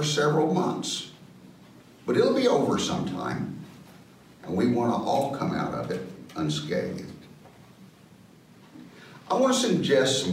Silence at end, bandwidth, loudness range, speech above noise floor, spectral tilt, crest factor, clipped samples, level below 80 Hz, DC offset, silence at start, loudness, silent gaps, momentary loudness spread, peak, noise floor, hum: 0 s; 16 kHz; 7 LU; 28 dB; -5 dB/octave; 16 dB; under 0.1%; -62 dBFS; under 0.1%; 0 s; -26 LUFS; none; 20 LU; -10 dBFS; -53 dBFS; none